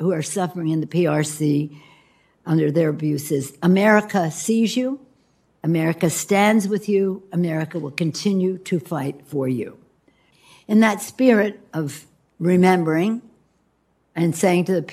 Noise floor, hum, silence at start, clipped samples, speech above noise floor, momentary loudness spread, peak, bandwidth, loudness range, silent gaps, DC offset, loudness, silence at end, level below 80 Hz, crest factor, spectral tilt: -65 dBFS; none; 0 s; under 0.1%; 45 dB; 11 LU; -2 dBFS; 15 kHz; 3 LU; none; under 0.1%; -20 LUFS; 0 s; -68 dBFS; 20 dB; -6 dB/octave